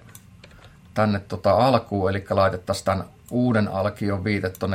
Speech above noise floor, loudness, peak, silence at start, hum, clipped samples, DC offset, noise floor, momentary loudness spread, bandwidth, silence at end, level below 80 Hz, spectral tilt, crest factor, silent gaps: 26 dB; -23 LUFS; -4 dBFS; 0.15 s; none; under 0.1%; under 0.1%; -48 dBFS; 7 LU; 16.5 kHz; 0 s; -56 dBFS; -6.5 dB/octave; 20 dB; none